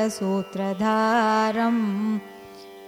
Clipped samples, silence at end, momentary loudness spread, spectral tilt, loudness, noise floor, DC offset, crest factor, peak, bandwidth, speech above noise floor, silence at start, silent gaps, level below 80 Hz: under 0.1%; 0 s; 18 LU; -5.5 dB/octave; -23 LUFS; -43 dBFS; under 0.1%; 14 dB; -10 dBFS; 15.5 kHz; 20 dB; 0 s; none; -66 dBFS